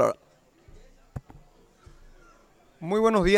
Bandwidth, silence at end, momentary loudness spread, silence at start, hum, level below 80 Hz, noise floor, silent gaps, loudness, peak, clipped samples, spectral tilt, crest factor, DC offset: 13.5 kHz; 0 s; 22 LU; 0 s; none; -46 dBFS; -60 dBFS; none; -26 LUFS; -8 dBFS; under 0.1%; -6 dB/octave; 20 dB; under 0.1%